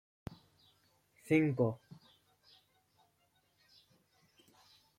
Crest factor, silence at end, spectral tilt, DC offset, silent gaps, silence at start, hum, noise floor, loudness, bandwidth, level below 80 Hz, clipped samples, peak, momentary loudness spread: 24 dB; 3.25 s; -8 dB/octave; under 0.1%; none; 0.3 s; 50 Hz at -70 dBFS; -76 dBFS; -33 LUFS; 14.5 kHz; -72 dBFS; under 0.1%; -18 dBFS; 22 LU